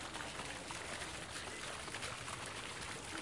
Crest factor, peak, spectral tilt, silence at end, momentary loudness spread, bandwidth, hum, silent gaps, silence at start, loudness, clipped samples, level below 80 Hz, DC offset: 18 dB; -28 dBFS; -2 dB/octave; 0 s; 1 LU; 11.5 kHz; none; none; 0 s; -44 LUFS; under 0.1%; -62 dBFS; under 0.1%